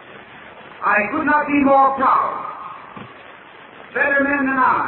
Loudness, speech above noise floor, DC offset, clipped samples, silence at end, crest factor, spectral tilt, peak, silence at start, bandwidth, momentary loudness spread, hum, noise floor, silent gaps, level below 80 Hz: -17 LUFS; 25 dB; under 0.1%; under 0.1%; 0 s; 16 dB; -9 dB/octave; -4 dBFS; 0.05 s; 4.2 kHz; 24 LU; none; -41 dBFS; none; -54 dBFS